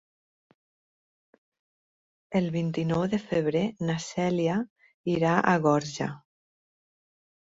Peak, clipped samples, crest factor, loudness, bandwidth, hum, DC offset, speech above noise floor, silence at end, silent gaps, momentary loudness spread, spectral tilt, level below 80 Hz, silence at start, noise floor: -8 dBFS; under 0.1%; 22 dB; -27 LUFS; 7.8 kHz; none; under 0.1%; over 64 dB; 1.4 s; 4.70-4.76 s, 4.94-5.04 s; 11 LU; -6.5 dB/octave; -62 dBFS; 2.3 s; under -90 dBFS